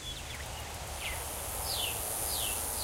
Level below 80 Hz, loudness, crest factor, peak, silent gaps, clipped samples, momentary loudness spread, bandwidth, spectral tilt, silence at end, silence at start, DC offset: -46 dBFS; -34 LUFS; 16 dB; -20 dBFS; none; under 0.1%; 9 LU; 16 kHz; -1.5 dB/octave; 0 s; 0 s; under 0.1%